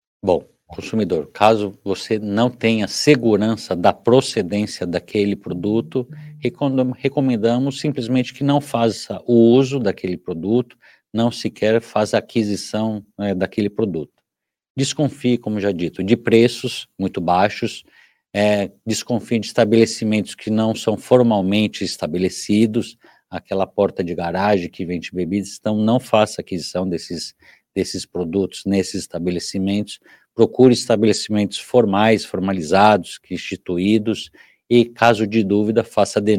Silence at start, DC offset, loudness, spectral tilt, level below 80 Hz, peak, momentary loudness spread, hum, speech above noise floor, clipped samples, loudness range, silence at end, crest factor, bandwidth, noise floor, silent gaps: 0.25 s; under 0.1%; -19 LUFS; -5.5 dB/octave; -58 dBFS; 0 dBFS; 11 LU; none; 65 dB; under 0.1%; 5 LU; 0 s; 18 dB; 15.5 kHz; -83 dBFS; 14.70-14.75 s